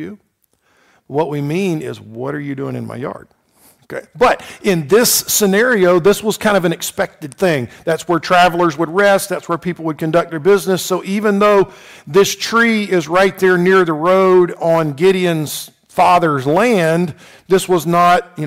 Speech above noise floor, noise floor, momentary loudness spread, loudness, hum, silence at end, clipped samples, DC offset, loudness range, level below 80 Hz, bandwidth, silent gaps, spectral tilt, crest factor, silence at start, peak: 46 dB; -60 dBFS; 12 LU; -14 LUFS; none; 0 s; under 0.1%; under 0.1%; 8 LU; -50 dBFS; 16 kHz; none; -4.5 dB/octave; 12 dB; 0 s; -2 dBFS